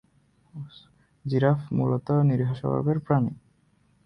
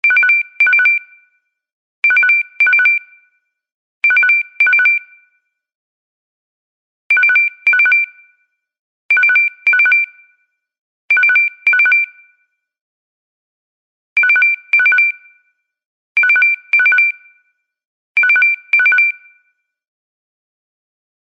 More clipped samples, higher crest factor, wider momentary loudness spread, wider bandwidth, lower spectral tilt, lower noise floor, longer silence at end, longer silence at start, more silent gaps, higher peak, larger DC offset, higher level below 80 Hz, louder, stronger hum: neither; first, 20 dB vs 12 dB; first, 20 LU vs 7 LU; second, 5.6 kHz vs 7.6 kHz; first, -10.5 dB/octave vs 0.5 dB/octave; about the same, -64 dBFS vs -64 dBFS; second, 0.7 s vs 2.1 s; first, 0.55 s vs 0.05 s; second, none vs 1.73-2.02 s, 3.72-4.01 s, 5.75-7.10 s, 8.79-9.09 s, 10.78-11.09 s, 12.81-14.16 s, 15.85-16.15 s, 17.85-18.15 s; second, -8 dBFS vs -4 dBFS; neither; first, -58 dBFS vs -86 dBFS; second, -25 LUFS vs -11 LUFS; neither